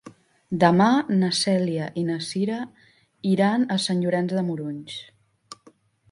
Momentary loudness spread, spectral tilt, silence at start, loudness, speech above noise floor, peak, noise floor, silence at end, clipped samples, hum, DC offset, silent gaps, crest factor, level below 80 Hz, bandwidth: 13 LU; -5.5 dB/octave; 0.05 s; -23 LUFS; 34 dB; -2 dBFS; -57 dBFS; 0.6 s; under 0.1%; none; under 0.1%; none; 22 dB; -66 dBFS; 11.5 kHz